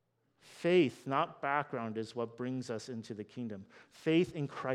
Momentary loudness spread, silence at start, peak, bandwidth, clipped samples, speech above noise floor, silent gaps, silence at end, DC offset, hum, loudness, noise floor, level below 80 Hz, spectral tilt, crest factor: 14 LU; 0.45 s; -16 dBFS; 11.5 kHz; under 0.1%; 32 dB; none; 0 s; under 0.1%; none; -35 LUFS; -66 dBFS; -76 dBFS; -6.5 dB/octave; 20 dB